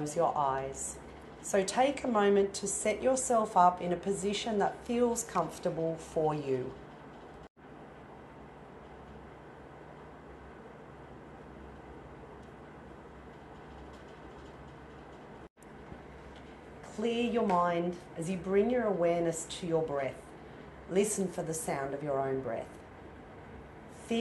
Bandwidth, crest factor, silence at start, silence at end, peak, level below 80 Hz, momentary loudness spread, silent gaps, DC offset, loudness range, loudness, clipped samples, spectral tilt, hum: 12 kHz; 22 dB; 0 s; 0 s; -12 dBFS; -60 dBFS; 22 LU; 7.50-7.55 s, 15.50-15.56 s; under 0.1%; 21 LU; -32 LUFS; under 0.1%; -4.5 dB/octave; none